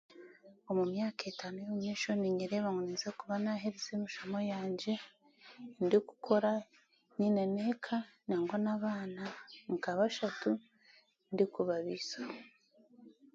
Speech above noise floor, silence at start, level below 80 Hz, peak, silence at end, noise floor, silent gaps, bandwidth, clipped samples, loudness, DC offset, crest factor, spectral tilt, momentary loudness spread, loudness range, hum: 31 dB; 0.1 s; -80 dBFS; -16 dBFS; 0.25 s; -67 dBFS; none; 7.6 kHz; under 0.1%; -36 LUFS; under 0.1%; 22 dB; -5.5 dB/octave; 11 LU; 3 LU; none